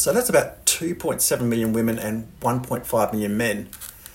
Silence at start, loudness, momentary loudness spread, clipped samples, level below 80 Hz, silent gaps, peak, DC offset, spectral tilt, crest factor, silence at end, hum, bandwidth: 0 s; -22 LUFS; 9 LU; under 0.1%; -50 dBFS; none; -2 dBFS; under 0.1%; -4 dB/octave; 22 dB; 0.05 s; none; 16.5 kHz